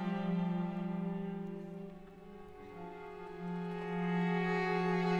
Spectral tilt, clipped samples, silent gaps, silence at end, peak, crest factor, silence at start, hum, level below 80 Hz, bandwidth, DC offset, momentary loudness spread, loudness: -8 dB/octave; under 0.1%; none; 0 s; -22 dBFS; 14 dB; 0 s; none; -64 dBFS; 7.2 kHz; under 0.1%; 18 LU; -37 LUFS